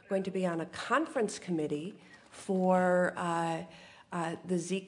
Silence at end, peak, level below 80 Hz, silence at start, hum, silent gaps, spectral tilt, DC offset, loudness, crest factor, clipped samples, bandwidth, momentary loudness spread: 0 s; -14 dBFS; -76 dBFS; 0.1 s; none; none; -6 dB/octave; under 0.1%; -32 LUFS; 18 dB; under 0.1%; 11 kHz; 13 LU